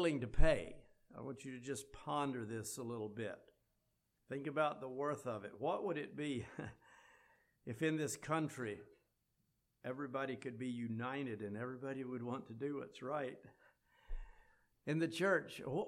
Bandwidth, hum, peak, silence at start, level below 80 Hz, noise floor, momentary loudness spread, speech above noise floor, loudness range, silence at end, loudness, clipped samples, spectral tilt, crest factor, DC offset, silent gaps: 14.5 kHz; none; -16 dBFS; 0 s; -50 dBFS; -83 dBFS; 15 LU; 43 dB; 3 LU; 0 s; -42 LUFS; under 0.1%; -5.5 dB/octave; 24 dB; under 0.1%; none